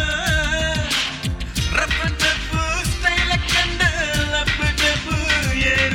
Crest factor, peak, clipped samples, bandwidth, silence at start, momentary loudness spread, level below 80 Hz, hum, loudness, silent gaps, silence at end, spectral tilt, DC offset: 16 dB; -4 dBFS; under 0.1%; 16.5 kHz; 0 s; 4 LU; -28 dBFS; none; -19 LUFS; none; 0 s; -3 dB/octave; under 0.1%